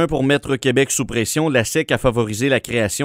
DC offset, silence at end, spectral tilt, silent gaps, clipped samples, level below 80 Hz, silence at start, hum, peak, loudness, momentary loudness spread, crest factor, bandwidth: under 0.1%; 0 s; -4.5 dB/octave; none; under 0.1%; -40 dBFS; 0 s; none; -2 dBFS; -18 LUFS; 2 LU; 16 dB; 16 kHz